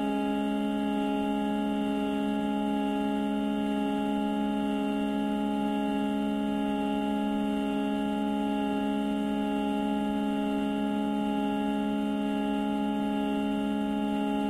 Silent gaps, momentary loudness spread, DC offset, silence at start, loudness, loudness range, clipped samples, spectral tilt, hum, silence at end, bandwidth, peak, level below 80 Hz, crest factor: none; 0 LU; under 0.1%; 0 s; -29 LUFS; 0 LU; under 0.1%; -7 dB/octave; none; 0 s; 13 kHz; -18 dBFS; -54 dBFS; 10 dB